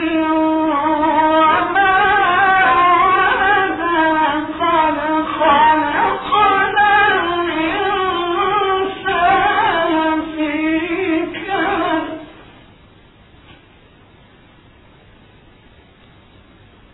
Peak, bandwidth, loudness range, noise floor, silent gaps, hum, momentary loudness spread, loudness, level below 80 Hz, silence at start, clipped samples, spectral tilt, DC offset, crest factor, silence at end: -2 dBFS; 4.1 kHz; 9 LU; -46 dBFS; none; none; 7 LU; -15 LUFS; -44 dBFS; 0 s; under 0.1%; -8 dB/octave; under 0.1%; 14 dB; 4.5 s